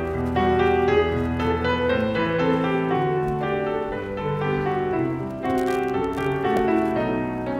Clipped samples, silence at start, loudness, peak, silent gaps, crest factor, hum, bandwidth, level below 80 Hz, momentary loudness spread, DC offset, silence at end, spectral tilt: under 0.1%; 0 s; -23 LUFS; -8 dBFS; none; 14 dB; none; 14.5 kHz; -42 dBFS; 6 LU; under 0.1%; 0 s; -7.5 dB/octave